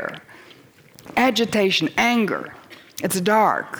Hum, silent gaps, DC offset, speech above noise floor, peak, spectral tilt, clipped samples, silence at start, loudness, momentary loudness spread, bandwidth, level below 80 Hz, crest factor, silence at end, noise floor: none; none; under 0.1%; 29 dB; -6 dBFS; -4 dB/octave; under 0.1%; 0 s; -20 LUFS; 17 LU; over 20 kHz; -62 dBFS; 16 dB; 0 s; -49 dBFS